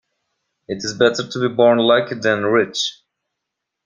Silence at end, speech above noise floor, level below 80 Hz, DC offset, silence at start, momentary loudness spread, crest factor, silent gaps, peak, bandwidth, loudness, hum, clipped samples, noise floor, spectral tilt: 0.9 s; 63 dB; -60 dBFS; under 0.1%; 0.7 s; 11 LU; 18 dB; none; -2 dBFS; 9.6 kHz; -17 LUFS; none; under 0.1%; -80 dBFS; -4 dB/octave